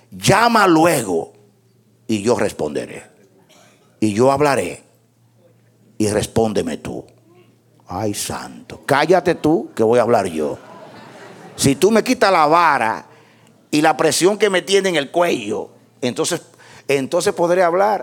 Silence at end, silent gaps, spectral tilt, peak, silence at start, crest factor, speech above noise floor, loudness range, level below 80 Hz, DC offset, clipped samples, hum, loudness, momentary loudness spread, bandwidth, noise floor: 0 s; none; -4.5 dB/octave; 0 dBFS; 0.1 s; 18 dB; 39 dB; 7 LU; -52 dBFS; under 0.1%; under 0.1%; none; -17 LUFS; 16 LU; 18.5 kHz; -55 dBFS